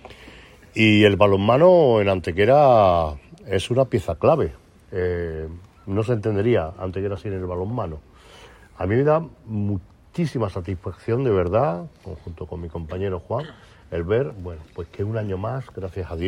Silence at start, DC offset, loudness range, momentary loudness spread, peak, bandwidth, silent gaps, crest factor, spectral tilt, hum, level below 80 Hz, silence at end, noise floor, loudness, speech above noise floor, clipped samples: 0.05 s; under 0.1%; 11 LU; 19 LU; -2 dBFS; 11.5 kHz; none; 20 dB; -7.5 dB/octave; none; -44 dBFS; 0 s; -46 dBFS; -21 LUFS; 26 dB; under 0.1%